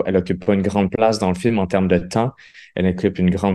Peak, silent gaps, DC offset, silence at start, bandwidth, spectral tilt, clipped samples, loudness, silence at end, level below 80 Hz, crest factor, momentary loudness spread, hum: -2 dBFS; none; under 0.1%; 0 s; 11.5 kHz; -7 dB/octave; under 0.1%; -19 LUFS; 0 s; -38 dBFS; 16 dB; 4 LU; none